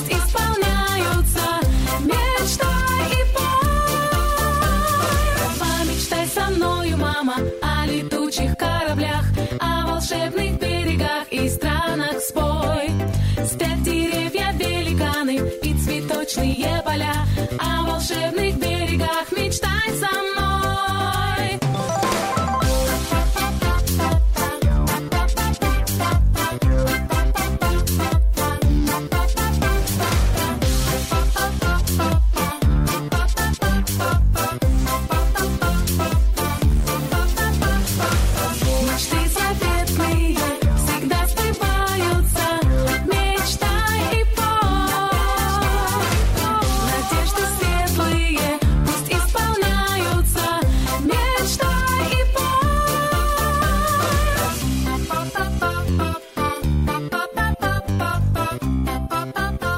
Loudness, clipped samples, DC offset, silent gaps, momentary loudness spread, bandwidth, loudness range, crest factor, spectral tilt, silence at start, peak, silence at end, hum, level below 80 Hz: -20 LUFS; under 0.1%; under 0.1%; none; 3 LU; 16.5 kHz; 2 LU; 10 dB; -4.5 dB/octave; 0 s; -8 dBFS; 0 s; none; -24 dBFS